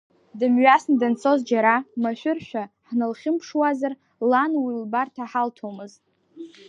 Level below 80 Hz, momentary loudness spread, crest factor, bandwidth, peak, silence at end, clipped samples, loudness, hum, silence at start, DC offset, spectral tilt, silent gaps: -76 dBFS; 15 LU; 20 dB; 7.8 kHz; -2 dBFS; 0.2 s; under 0.1%; -22 LUFS; none; 0.35 s; under 0.1%; -5.5 dB/octave; none